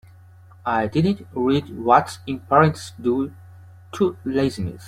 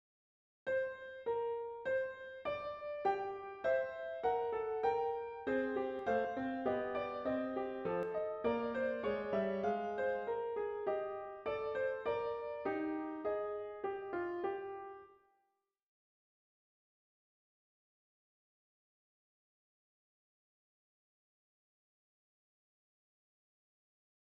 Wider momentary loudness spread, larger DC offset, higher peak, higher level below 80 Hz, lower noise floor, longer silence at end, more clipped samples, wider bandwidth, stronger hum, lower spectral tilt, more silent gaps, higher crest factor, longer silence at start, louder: first, 13 LU vs 6 LU; neither; first, -2 dBFS vs -22 dBFS; first, -54 dBFS vs -72 dBFS; second, -47 dBFS vs -84 dBFS; second, 0 s vs 9.1 s; neither; first, 15 kHz vs 7.4 kHz; neither; first, -7 dB/octave vs -4 dB/octave; neither; about the same, 20 dB vs 18 dB; about the same, 0.65 s vs 0.65 s; first, -21 LUFS vs -39 LUFS